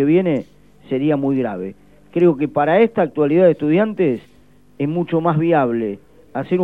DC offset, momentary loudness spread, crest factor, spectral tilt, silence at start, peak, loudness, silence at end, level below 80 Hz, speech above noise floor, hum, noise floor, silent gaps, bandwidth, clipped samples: 0.3%; 13 LU; 16 dB; -10 dB/octave; 0 s; -2 dBFS; -18 LUFS; 0 s; -58 dBFS; 35 dB; none; -51 dBFS; none; 4.2 kHz; under 0.1%